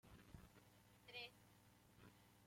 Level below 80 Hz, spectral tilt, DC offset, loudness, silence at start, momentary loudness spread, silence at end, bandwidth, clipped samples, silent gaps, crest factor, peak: -76 dBFS; -3.5 dB/octave; under 0.1%; -61 LUFS; 0.05 s; 13 LU; 0 s; 16.5 kHz; under 0.1%; none; 22 dB; -42 dBFS